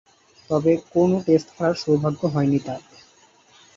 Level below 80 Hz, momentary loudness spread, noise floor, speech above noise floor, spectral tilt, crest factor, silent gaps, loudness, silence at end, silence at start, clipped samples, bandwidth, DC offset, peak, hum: -58 dBFS; 6 LU; -55 dBFS; 34 dB; -7.5 dB/octave; 18 dB; none; -21 LUFS; 0.95 s; 0.5 s; under 0.1%; 7.8 kHz; under 0.1%; -6 dBFS; none